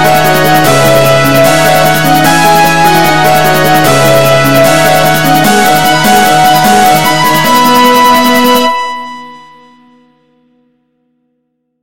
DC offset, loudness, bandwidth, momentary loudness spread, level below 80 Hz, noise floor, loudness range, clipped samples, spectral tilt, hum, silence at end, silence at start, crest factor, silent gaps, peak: 8%; -5 LUFS; over 20 kHz; 2 LU; -36 dBFS; -62 dBFS; 5 LU; 2%; -4 dB/octave; none; 0 s; 0 s; 8 dB; none; 0 dBFS